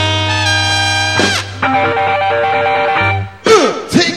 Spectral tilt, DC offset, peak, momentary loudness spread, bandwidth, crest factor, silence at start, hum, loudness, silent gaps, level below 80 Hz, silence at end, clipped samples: -3.5 dB/octave; 0.4%; 0 dBFS; 4 LU; 13.5 kHz; 12 dB; 0 s; none; -12 LUFS; none; -46 dBFS; 0 s; under 0.1%